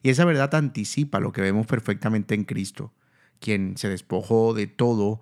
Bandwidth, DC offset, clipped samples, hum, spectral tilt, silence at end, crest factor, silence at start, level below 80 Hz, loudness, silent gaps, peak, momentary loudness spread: 14 kHz; under 0.1%; under 0.1%; none; -6.5 dB/octave; 0.05 s; 20 dB; 0.05 s; -64 dBFS; -24 LUFS; none; -4 dBFS; 10 LU